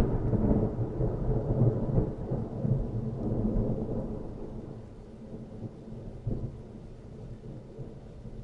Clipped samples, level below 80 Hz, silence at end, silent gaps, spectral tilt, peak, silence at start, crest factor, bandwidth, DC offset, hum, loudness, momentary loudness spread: under 0.1%; -38 dBFS; 0 s; none; -11.5 dB/octave; -10 dBFS; 0 s; 20 dB; 4.8 kHz; under 0.1%; none; -32 LUFS; 18 LU